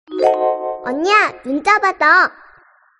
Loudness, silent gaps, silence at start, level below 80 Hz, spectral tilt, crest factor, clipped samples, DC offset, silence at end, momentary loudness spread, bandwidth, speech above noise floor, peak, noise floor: -15 LUFS; none; 0.1 s; -60 dBFS; -2.5 dB/octave; 16 dB; under 0.1%; under 0.1%; 0.7 s; 9 LU; 10.5 kHz; 36 dB; 0 dBFS; -50 dBFS